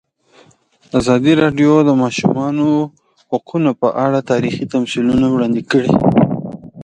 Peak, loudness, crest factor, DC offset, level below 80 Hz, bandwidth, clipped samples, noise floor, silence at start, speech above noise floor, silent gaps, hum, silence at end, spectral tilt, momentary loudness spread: 0 dBFS; -15 LUFS; 14 dB; under 0.1%; -46 dBFS; 10 kHz; under 0.1%; -51 dBFS; 0.95 s; 38 dB; none; none; 0 s; -7 dB/octave; 9 LU